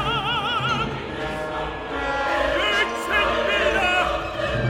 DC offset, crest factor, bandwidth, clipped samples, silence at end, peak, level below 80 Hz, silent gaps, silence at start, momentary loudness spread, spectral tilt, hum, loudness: under 0.1%; 16 dB; 16 kHz; under 0.1%; 0 s; -8 dBFS; -40 dBFS; none; 0 s; 8 LU; -4.5 dB/octave; none; -22 LUFS